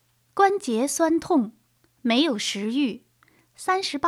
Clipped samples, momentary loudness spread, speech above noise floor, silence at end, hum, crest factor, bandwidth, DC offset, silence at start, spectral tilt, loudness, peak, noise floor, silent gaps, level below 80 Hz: under 0.1%; 11 LU; 38 dB; 0 s; none; 18 dB; 15 kHz; under 0.1%; 0.35 s; -3 dB/octave; -24 LUFS; -6 dBFS; -61 dBFS; none; -68 dBFS